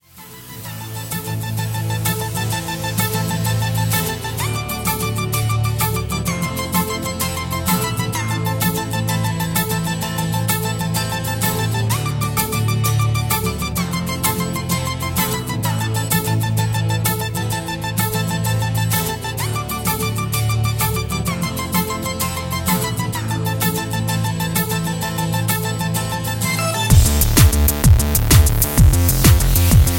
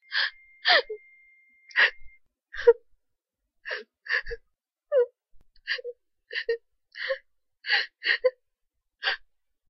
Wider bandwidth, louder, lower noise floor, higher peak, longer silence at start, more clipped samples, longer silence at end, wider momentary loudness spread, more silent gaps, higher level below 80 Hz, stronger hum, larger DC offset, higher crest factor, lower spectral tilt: first, 17 kHz vs 6.2 kHz; first, -19 LUFS vs -27 LUFS; second, -39 dBFS vs -81 dBFS; first, 0 dBFS vs -6 dBFS; about the same, 0.15 s vs 0.1 s; neither; second, 0 s vs 0.55 s; second, 9 LU vs 19 LU; neither; first, -26 dBFS vs -56 dBFS; neither; neither; second, 18 dB vs 24 dB; first, -4.5 dB/octave vs -1.5 dB/octave